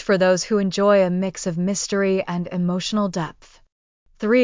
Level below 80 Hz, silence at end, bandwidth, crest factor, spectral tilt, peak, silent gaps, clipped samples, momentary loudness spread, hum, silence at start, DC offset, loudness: -56 dBFS; 0 s; 7.6 kHz; 16 dB; -5 dB/octave; -6 dBFS; 3.72-4.06 s; under 0.1%; 8 LU; none; 0 s; under 0.1%; -21 LUFS